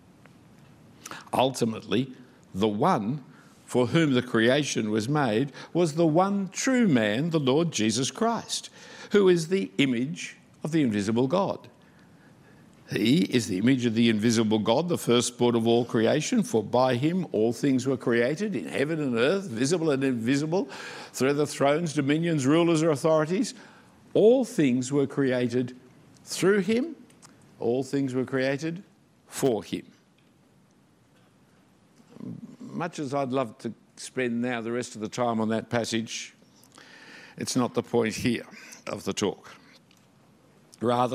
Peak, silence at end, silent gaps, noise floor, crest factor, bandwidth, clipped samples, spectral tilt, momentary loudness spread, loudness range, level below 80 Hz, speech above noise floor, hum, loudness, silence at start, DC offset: -8 dBFS; 0 s; none; -61 dBFS; 18 dB; 15.5 kHz; under 0.1%; -5.5 dB/octave; 14 LU; 8 LU; -70 dBFS; 36 dB; none; -26 LUFS; 1.05 s; under 0.1%